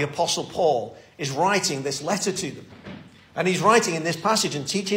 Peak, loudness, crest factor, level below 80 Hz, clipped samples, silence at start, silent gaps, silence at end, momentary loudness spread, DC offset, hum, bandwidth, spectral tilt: -6 dBFS; -23 LUFS; 18 dB; -62 dBFS; under 0.1%; 0 s; none; 0 s; 21 LU; under 0.1%; none; 16 kHz; -3.5 dB/octave